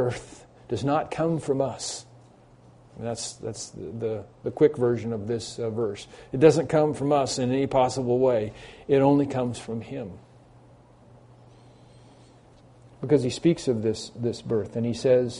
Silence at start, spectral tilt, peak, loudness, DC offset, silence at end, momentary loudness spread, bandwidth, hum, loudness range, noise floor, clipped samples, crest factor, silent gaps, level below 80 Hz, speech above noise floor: 0 s; -6 dB/octave; -4 dBFS; -25 LUFS; under 0.1%; 0 s; 15 LU; 10.5 kHz; none; 9 LU; -53 dBFS; under 0.1%; 22 dB; none; -56 dBFS; 28 dB